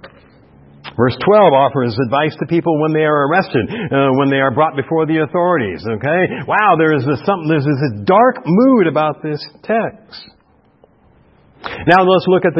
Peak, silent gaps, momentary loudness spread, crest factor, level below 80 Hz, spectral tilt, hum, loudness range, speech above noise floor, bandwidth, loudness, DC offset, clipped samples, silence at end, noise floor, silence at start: 0 dBFS; none; 9 LU; 14 dB; -52 dBFS; -9.5 dB/octave; none; 4 LU; 37 dB; 5.8 kHz; -14 LUFS; under 0.1%; under 0.1%; 0 s; -51 dBFS; 0 s